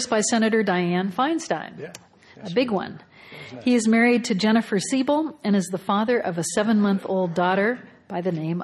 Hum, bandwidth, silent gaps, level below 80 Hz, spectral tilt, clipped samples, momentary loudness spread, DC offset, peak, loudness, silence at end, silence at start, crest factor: none; 12.5 kHz; none; -66 dBFS; -5 dB/octave; under 0.1%; 14 LU; under 0.1%; -8 dBFS; -22 LUFS; 0 s; 0 s; 16 dB